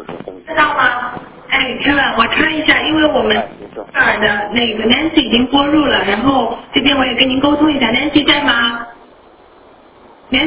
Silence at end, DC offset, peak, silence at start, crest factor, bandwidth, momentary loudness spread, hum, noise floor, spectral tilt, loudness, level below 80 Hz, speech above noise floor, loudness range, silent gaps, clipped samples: 0 s; under 0.1%; 0 dBFS; 0 s; 14 dB; 4 kHz; 10 LU; none; -43 dBFS; -7.5 dB/octave; -13 LUFS; -40 dBFS; 30 dB; 1 LU; none; under 0.1%